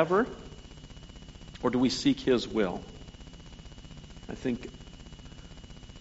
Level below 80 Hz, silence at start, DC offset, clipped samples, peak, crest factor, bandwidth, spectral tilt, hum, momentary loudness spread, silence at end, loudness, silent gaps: -50 dBFS; 0 s; under 0.1%; under 0.1%; -8 dBFS; 24 dB; 8 kHz; -4.5 dB/octave; none; 22 LU; 0 s; -29 LUFS; none